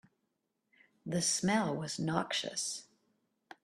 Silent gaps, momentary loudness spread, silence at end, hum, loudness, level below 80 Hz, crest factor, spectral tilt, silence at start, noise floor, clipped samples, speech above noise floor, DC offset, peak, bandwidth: none; 8 LU; 0.8 s; none; -34 LUFS; -74 dBFS; 22 dB; -3.5 dB/octave; 1.05 s; -83 dBFS; under 0.1%; 49 dB; under 0.1%; -14 dBFS; 13.5 kHz